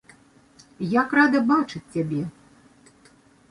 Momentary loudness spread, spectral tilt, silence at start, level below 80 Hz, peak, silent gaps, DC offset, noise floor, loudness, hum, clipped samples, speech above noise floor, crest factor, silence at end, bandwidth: 13 LU; -7 dB/octave; 0.8 s; -64 dBFS; -6 dBFS; none; under 0.1%; -55 dBFS; -22 LUFS; none; under 0.1%; 34 dB; 18 dB; 1.2 s; 11 kHz